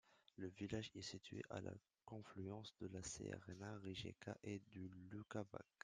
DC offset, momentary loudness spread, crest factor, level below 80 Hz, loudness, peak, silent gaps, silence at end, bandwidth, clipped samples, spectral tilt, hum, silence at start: under 0.1%; 8 LU; 20 dB; -76 dBFS; -53 LUFS; -32 dBFS; none; 0.2 s; 10 kHz; under 0.1%; -5 dB/octave; none; 0.05 s